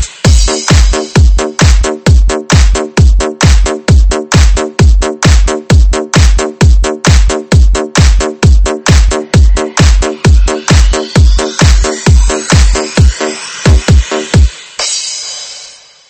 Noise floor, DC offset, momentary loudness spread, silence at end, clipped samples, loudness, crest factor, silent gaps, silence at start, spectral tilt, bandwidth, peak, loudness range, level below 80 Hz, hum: -33 dBFS; under 0.1%; 2 LU; 0.4 s; 3%; -9 LUFS; 6 dB; none; 0 s; -4.5 dB/octave; 8.8 kHz; 0 dBFS; 1 LU; -8 dBFS; none